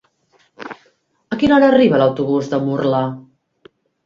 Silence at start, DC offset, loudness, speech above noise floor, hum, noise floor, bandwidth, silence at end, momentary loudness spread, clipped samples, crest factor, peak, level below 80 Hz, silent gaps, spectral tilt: 0.6 s; under 0.1%; -15 LUFS; 45 dB; none; -59 dBFS; 7.2 kHz; 0.85 s; 23 LU; under 0.1%; 18 dB; 0 dBFS; -52 dBFS; none; -7.5 dB/octave